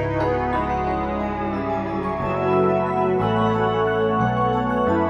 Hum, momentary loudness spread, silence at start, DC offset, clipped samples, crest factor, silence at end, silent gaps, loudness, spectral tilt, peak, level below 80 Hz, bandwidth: none; 5 LU; 0 s; under 0.1%; under 0.1%; 14 dB; 0 s; none; -21 LUFS; -8.5 dB/octave; -8 dBFS; -38 dBFS; 8.4 kHz